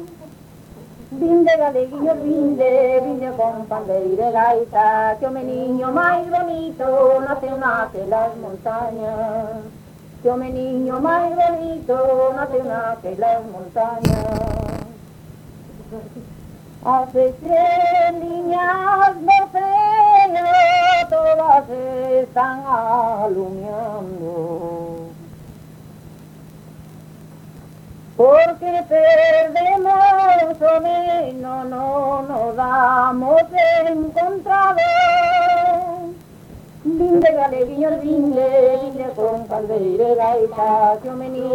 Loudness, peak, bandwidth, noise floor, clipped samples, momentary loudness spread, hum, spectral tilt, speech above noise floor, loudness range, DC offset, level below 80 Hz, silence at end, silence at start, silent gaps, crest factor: -17 LUFS; 0 dBFS; 16.5 kHz; -41 dBFS; under 0.1%; 13 LU; none; -6.5 dB/octave; 24 dB; 9 LU; under 0.1%; -46 dBFS; 0 s; 0 s; none; 16 dB